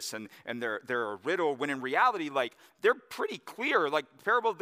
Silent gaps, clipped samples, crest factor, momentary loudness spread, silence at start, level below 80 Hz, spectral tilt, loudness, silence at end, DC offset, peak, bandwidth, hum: none; under 0.1%; 20 dB; 10 LU; 0 s; -86 dBFS; -3.5 dB/octave; -30 LUFS; 0 s; under 0.1%; -12 dBFS; 15.5 kHz; none